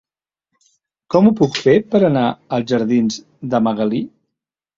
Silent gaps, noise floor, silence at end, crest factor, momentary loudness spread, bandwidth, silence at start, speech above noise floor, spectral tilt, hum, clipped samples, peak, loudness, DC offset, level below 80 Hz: none; -81 dBFS; 0.7 s; 16 dB; 9 LU; 7.6 kHz; 1.1 s; 65 dB; -6.5 dB/octave; none; under 0.1%; -2 dBFS; -16 LUFS; under 0.1%; -56 dBFS